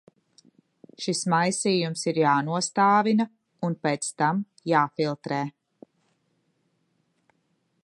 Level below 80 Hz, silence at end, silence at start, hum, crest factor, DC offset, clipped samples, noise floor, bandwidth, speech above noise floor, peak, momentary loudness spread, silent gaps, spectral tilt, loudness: -78 dBFS; 2.35 s; 1 s; none; 20 dB; under 0.1%; under 0.1%; -72 dBFS; 11.5 kHz; 48 dB; -6 dBFS; 10 LU; none; -4.5 dB/octave; -25 LUFS